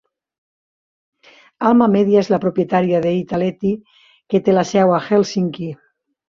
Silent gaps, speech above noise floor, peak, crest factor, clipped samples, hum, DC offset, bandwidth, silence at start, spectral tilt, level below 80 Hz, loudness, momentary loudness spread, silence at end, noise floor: none; over 74 dB; -2 dBFS; 16 dB; under 0.1%; none; under 0.1%; 7.4 kHz; 1.6 s; -7 dB/octave; -58 dBFS; -17 LUFS; 9 LU; 0.55 s; under -90 dBFS